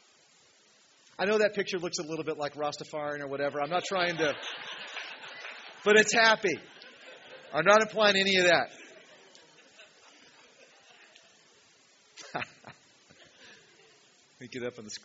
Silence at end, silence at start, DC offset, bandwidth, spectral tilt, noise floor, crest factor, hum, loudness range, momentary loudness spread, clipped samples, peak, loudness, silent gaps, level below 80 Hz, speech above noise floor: 0.05 s; 1.2 s; under 0.1%; 8 kHz; -1 dB/octave; -62 dBFS; 26 dB; none; 21 LU; 21 LU; under 0.1%; -6 dBFS; -27 LUFS; none; -76 dBFS; 35 dB